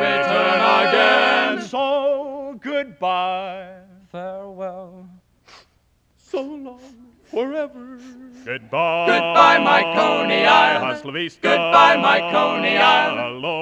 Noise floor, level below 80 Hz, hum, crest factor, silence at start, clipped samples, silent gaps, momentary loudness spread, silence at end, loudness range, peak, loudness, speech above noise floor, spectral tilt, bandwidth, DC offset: -61 dBFS; -64 dBFS; none; 18 dB; 0 s; under 0.1%; none; 19 LU; 0 s; 18 LU; 0 dBFS; -17 LUFS; 43 dB; -4 dB/octave; 10.5 kHz; under 0.1%